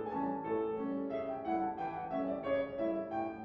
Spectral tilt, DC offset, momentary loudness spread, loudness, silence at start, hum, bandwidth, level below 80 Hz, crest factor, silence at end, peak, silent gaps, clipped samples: -6 dB/octave; under 0.1%; 3 LU; -37 LUFS; 0 s; none; 5.8 kHz; -66 dBFS; 14 dB; 0 s; -24 dBFS; none; under 0.1%